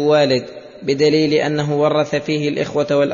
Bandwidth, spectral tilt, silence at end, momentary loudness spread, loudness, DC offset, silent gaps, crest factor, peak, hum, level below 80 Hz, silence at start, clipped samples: 7.4 kHz; -6 dB/octave; 0 s; 7 LU; -17 LUFS; under 0.1%; none; 12 dB; -4 dBFS; none; -56 dBFS; 0 s; under 0.1%